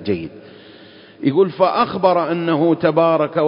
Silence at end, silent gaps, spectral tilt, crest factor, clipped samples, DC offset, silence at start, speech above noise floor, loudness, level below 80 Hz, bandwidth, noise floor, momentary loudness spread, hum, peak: 0 s; none; -11.5 dB/octave; 18 dB; under 0.1%; under 0.1%; 0 s; 26 dB; -17 LUFS; -54 dBFS; 5.4 kHz; -43 dBFS; 8 LU; none; 0 dBFS